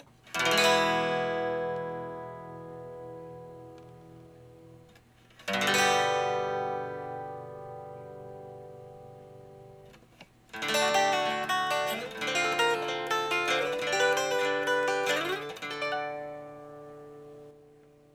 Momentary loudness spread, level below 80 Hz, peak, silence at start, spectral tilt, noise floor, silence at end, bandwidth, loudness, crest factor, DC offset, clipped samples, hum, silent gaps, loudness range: 23 LU; -70 dBFS; -10 dBFS; 0.25 s; -2.5 dB/octave; -58 dBFS; 0.6 s; over 20 kHz; -28 LUFS; 22 dB; under 0.1%; under 0.1%; none; none; 15 LU